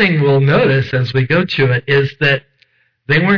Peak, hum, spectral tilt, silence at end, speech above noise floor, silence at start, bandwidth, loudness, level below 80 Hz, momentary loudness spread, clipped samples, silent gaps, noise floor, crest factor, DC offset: -4 dBFS; none; -8 dB/octave; 0 s; 44 dB; 0 s; 5.4 kHz; -14 LUFS; -46 dBFS; 4 LU; under 0.1%; none; -56 dBFS; 10 dB; 0.3%